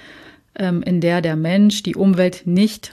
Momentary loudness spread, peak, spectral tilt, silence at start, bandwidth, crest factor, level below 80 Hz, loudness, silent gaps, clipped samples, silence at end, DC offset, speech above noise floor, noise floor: 7 LU; -6 dBFS; -6.5 dB/octave; 0.1 s; 13.5 kHz; 12 dB; -56 dBFS; -17 LUFS; none; under 0.1%; 0.05 s; under 0.1%; 27 dB; -44 dBFS